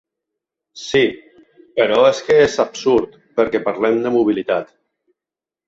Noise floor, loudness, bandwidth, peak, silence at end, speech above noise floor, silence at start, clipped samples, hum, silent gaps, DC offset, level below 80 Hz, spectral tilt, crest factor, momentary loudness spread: -88 dBFS; -17 LUFS; 8 kHz; -2 dBFS; 1.05 s; 72 dB; 0.75 s; under 0.1%; none; none; under 0.1%; -54 dBFS; -4.5 dB/octave; 16 dB; 9 LU